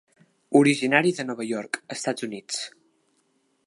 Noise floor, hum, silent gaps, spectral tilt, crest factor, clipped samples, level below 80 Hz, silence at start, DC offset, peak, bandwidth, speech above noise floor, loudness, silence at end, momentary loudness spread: -69 dBFS; none; none; -4.5 dB/octave; 22 dB; under 0.1%; -78 dBFS; 0.5 s; under 0.1%; -4 dBFS; 11.5 kHz; 45 dB; -24 LUFS; 1 s; 13 LU